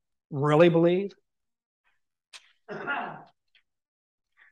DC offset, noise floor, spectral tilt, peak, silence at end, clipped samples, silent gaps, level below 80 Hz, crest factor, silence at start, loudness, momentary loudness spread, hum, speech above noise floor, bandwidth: under 0.1%; -70 dBFS; -8 dB/octave; -6 dBFS; 1.35 s; under 0.1%; 1.65-1.84 s, 2.28-2.32 s; -76 dBFS; 22 dB; 0.3 s; -24 LUFS; 19 LU; none; 47 dB; 9 kHz